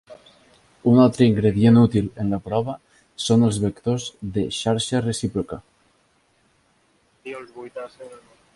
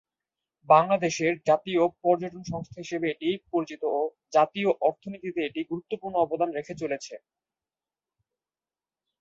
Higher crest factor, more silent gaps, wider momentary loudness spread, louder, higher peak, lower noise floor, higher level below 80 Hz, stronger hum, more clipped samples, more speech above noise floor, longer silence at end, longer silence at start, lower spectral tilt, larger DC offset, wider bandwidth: about the same, 18 dB vs 22 dB; neither; first, 21 LU vs 13 LU; first, -20 LUFS vs -27 LUFS; about the same, -4 dBFS vs -6 dBFS; second, -63 dBFS vs under -90 dBFS; first, -50 dBFS vs -68 dBFS; neither; neither; second, 43 dB vs over 64 dB; second, 0.4 s vs 2.05 s; second, 0.1 s vs 0.7 s; about the same, -6.5 dB/octave vs -5.5 dB/octave; neither; first, 11.5 kHz vs 7.8 kHz